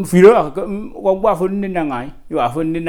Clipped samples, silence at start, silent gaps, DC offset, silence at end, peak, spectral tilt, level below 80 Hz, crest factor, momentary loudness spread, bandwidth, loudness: under 0.1%; 0 s; none; under 0.1%; 0 s; 0 dBFS; -7 dB/octave; -40 dBFS; 14 dB; 15 LU; 17 kHz; -16 LUFS